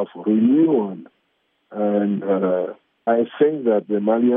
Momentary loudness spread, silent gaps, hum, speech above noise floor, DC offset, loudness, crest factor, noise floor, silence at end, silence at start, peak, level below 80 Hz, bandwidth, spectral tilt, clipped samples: 12 LU; none; none; 50 dB; under 0.1%; -20 LUFS; 14 dB; -68 dBFS; 0 s; 0 s; -4 dBFS; -78 dBFS; 3.7 kHz; -7.5 dB/octave; under 0.1%